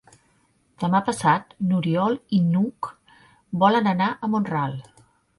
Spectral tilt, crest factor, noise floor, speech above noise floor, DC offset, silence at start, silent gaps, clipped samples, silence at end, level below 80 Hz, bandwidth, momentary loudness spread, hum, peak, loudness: -7 dB/octave; 18 dB; -64 dBFS; 42 dB; under 0.1%; 0.8 s; none; under 0.1%; 0.55 s; -62 dBFS; 11.5 kHz; 11 LU; none; -6 dBFS; -22 LUFS